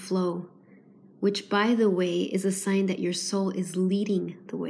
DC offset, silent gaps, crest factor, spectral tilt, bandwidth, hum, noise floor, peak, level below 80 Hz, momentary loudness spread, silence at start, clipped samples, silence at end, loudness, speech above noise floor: under 0.1%; none; 16 dB; -5.5 dB/octave; 11 kHz; none; -54 dBFS; -12 dBFS; -82 dBFS; 7 LU; 0 s; under 0.1%; 0 s; -27 LUFS; 28 dB